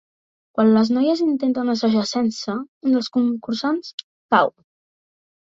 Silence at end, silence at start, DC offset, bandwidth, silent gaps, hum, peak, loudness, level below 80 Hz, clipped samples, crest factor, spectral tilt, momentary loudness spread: 1.1 s; 0.55 s; under 0.1%; 7.8 kHz; 2.68-2.81 s, 3.94-3.98 s, 4.04-4.29 s; none; -2 dBFS; -20 LUFS; -66 dBFS; under 0.1%; 20 dB; -5.5 dB/octave; 10 LU